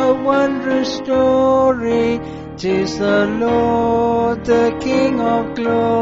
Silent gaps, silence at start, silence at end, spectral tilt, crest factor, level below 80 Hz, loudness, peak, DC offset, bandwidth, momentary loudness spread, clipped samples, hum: none; 0 s; 0 s; -5 dB/octave; 12 dB; -42 dBFS; -16 LUFS; -4 dBFS; under 0.1%; 7.8 kHz; 5 LU; under 0.1%; none